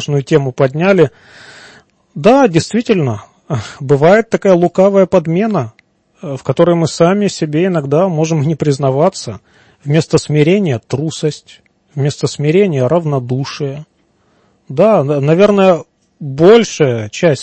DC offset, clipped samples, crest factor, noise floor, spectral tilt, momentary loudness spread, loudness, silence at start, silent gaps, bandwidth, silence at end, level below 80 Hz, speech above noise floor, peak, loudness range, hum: under 0.1%; under 0.1%; 12 dB; -56 dBFS; -6.5 dB/octave; 14 LU; -12 LUFS; 0 s; none; 8.8 kHz; 0 s; -50 dBFS; 44 dB; 0 dBFS; 4 LU; none